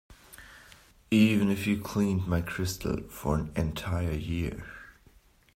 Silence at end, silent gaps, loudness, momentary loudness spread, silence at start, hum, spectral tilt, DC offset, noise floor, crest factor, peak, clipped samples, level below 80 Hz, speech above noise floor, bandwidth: 0.65 s; none; -29 LUFS; 23 LU; 0.1 s; none; -6 dB/octave; under 0.1%; -60 dBFS; 18 dB; -12 dBFS; under 0.1%; -46 dBFS; 32 dB; 16 kHz